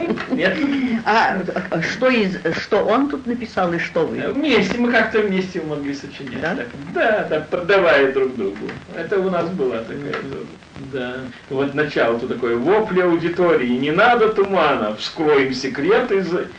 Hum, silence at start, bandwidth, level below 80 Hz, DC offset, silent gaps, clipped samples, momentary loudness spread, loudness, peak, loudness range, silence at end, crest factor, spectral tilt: none; 0 s; 9.2 kHz; -54 dBFS; under 0.1%; none; under 0.1%; 11 LU; -19 LUFS; -4 dBFS; 6 LU; 0 s; 16 dB; -6 dB/octave